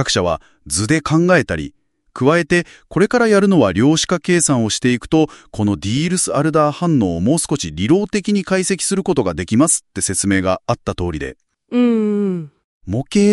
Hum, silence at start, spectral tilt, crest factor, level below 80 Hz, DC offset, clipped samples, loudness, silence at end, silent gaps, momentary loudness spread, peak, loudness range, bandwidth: none; 0 s; -4.5 dB/octave; 16 dB; -44 dBFS; under 0.1%; under 0.1%; -16 LUFS; 0 s; 12.64-12.81 s; 9 LU; 0 dBFS; 3 LU; 13 kHz